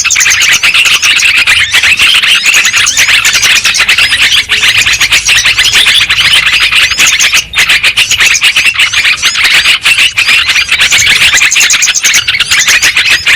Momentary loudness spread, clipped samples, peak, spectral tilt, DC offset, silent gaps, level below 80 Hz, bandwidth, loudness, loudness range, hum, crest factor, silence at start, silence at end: 2 LU; 5%; 0 dBFS; 2 dB/octave; under 0.1%; none; -36 dBFS; over 20 kHz; -3 LUFS; 1 LU; none; 6 dB; 0 s; 0 s